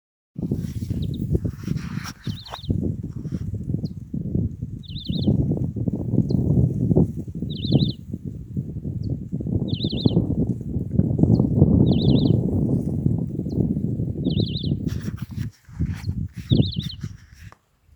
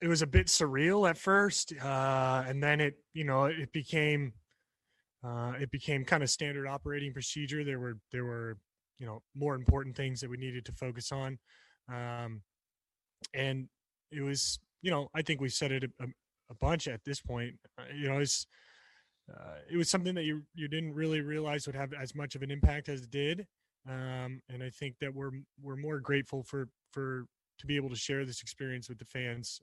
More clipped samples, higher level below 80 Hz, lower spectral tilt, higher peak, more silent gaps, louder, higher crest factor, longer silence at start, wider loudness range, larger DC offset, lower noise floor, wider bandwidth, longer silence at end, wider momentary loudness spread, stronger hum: neither; first, -38 dBFS vs -46 dBFS; first, -8.5 dB/octave vs -4.5 dB/octave; first, 0 dBFS vs -10 dBFS; neither; first, -24 LUFS vs -34 LUFS; about the same, 22 dB vs 26 dB; first, 0.35 s vs 0 s; about the same, 8 LU vs 8 LU; neither; second, -48 dBFS vs under -90 dBFS; first, over 20 kHz vs 12 kHz; first, 0.45 s vs 0.05 s; second, 13 LU vs 16 LU; neither